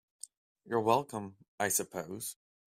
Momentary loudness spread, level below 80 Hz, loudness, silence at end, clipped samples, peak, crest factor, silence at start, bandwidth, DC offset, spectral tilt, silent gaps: 21 LU; -76 dBFS; -34 LUFS; 0.35 s; under 0.1%; -12 dBFS; 24 dB; 0.65 s; 16 kHz; under 0.1%; -3.5 dB/octave; 1.48-1.58 s